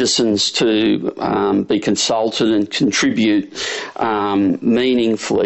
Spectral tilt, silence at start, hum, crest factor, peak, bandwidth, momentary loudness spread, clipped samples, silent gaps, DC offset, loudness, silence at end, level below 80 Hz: -3.5 dB/octave; 0 s; none; 12 dB; -6 dBFS; 8.4 kHz; 5 LU; under 0.1%; none; under 0.1%; -16 LUFS; 0 s; -52 dBFS